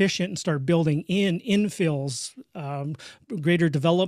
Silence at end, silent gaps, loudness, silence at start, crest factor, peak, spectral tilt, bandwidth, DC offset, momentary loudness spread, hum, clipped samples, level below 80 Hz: 0 s; none; -25 LUFS; 0 s; 16 dB; -8 dBFS; -5.5 dB/octave; 13.5 kHz; under 0.1%; 13 LU; none; under 0.1%; -64 dBFS